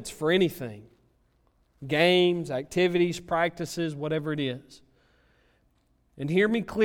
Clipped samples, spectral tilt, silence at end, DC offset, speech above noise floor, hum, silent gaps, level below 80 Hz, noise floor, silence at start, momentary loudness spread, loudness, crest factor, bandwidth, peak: under 0.1%; -5.5 dB/octave; 0 s; under 0.1%; 41 dB; none; none; -60 dBFS; -67 dBFS; 0 s; 14 LU; -26 LUFS; 20 dB; 17 kHz; -8 dBFS